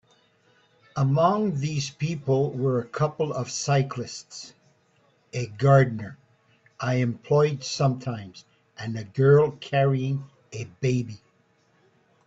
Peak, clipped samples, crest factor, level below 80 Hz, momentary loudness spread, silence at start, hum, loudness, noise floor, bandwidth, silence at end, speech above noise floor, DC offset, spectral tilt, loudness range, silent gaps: -6 dBFS; under 0.1%; 20 dB; -62 dBFS; 18 LU; 0.95 s; none; -25 LUFS; -64 dBFS; 8 kHz; 1.1 s; 40 dB; under 0.1%; -6.5 dB/octave; 3 LU; none